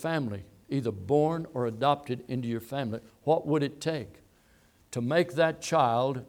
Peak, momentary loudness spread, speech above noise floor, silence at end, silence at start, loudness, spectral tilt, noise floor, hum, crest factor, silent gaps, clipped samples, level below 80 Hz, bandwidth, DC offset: -10 dBFS; 10 LU; 34 dB; 0.05 s; 0 s; -29 LUFS; -6 dB/octave; -62 dBFS; none; 20 dB; none; under 0.1%; -66 dBFS; 18 kHz; under 0.1%